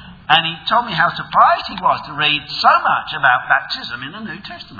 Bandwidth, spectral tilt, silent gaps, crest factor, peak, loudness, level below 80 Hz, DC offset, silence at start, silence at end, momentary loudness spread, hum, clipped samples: 5.4 kHz; -4.5 dB/octave; none; 18 dB; 0 dBFS; -15 LUFS; -52 dBFS; under 0.1%; 0 s; 0 s; 14 LU; none; under 0.1%